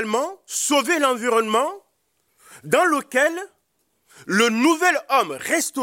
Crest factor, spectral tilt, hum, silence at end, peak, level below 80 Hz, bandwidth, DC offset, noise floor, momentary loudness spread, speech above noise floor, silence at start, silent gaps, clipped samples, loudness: 16 dB; -2.5 dB/octave; none; 0 s; -4 dBFS; -72 dBFS; 16.5 kHz; under 0.1%; -70 dBFS; 7 LU; 49 dB; 0 s; none; under 0.1%; -20 LUFS